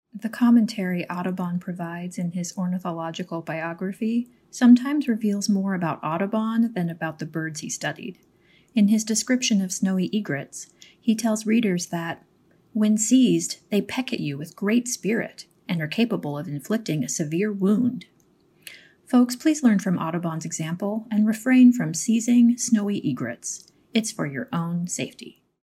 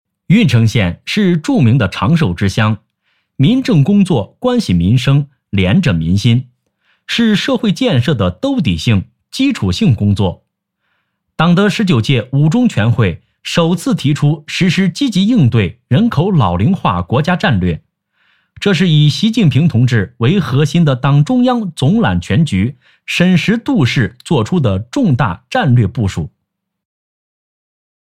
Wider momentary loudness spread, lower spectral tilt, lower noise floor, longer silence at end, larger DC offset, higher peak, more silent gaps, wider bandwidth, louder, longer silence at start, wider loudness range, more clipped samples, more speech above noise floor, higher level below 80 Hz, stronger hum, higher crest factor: first, 13 LU vs 5 LU; second, -5 dB/octave vs -6.5 dB/octave; second, -60 dBFS vs -73 dBFS; second, 0.35 s vs 1.85 s; neither; second, -6 dBFS vs 0 dBFS; neither; first, 15 kHz vs 13 kHz; second, -24 LUFS vs -13 LUFS; second, 0.15 s vs 0.3 s; about the same, 5 LU vs 3 LU; neither; second, 37 dB vs 61 dB; second, -74 dBFS vs -40 dBFS; neither; first, 18 dB vs 12 dB